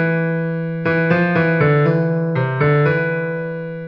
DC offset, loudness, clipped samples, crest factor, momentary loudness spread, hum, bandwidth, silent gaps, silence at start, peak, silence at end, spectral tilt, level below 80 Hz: under 0.1%; -17 LUFS; under 0.1%; 14 dB; 7 LU; none; 5.6 kHz; none; 0 s; -2 dBFS; 0 s; -10 dB/octave; -52 dBFS